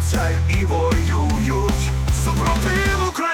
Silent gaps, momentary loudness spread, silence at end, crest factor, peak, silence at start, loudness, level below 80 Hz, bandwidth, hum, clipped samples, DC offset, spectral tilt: none; 2 LU; 0 s; 10 dB; -8 dBFS; 0 s; -19 LUFS; -24 dBFS; 17 kHz; none; under 0.1%; under 0.1%; -5.5 dB/octave